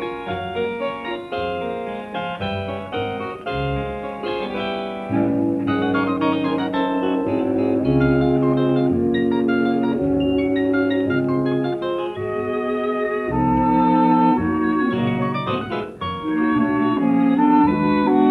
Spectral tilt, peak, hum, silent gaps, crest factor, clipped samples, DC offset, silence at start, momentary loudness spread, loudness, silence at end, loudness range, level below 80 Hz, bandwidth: -8.5 dB/octave; -6 dBFS; none; none; 14 dB; under 0.1%; under 0.1%; 0 s; 10 LU; -20 LUFS; 0 s; 7 LU; -44 dBFS; 5 kHz